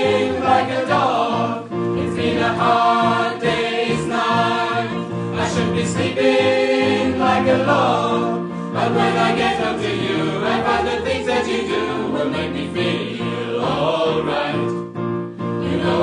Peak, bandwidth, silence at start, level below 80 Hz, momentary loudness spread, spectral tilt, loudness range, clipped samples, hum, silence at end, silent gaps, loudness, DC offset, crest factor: -2 dBFS; 10.5 kHz; 0 s; -52 dBFS; 8 LU; -5.5 dB/octave; 4 LU; under 0.1%; none; 0 s; none; -19 LUFS; under 0.1%; 16 dB